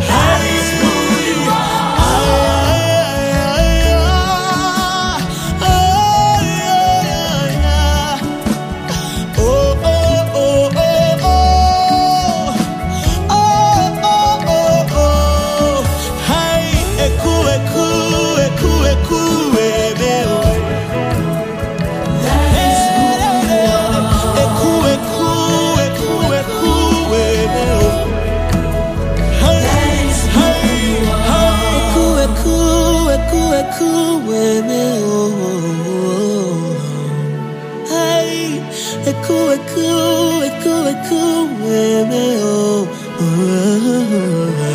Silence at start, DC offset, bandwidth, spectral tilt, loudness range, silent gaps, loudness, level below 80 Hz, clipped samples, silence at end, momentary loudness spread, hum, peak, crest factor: 0 s; 0.1%; 15.5 kHz; -5 dB/octave; 3 LU; none; -14 LUFS; -22 dBFS; under 0.1%; 0 s; 6 LU; none; 0 dBFS; 12 dB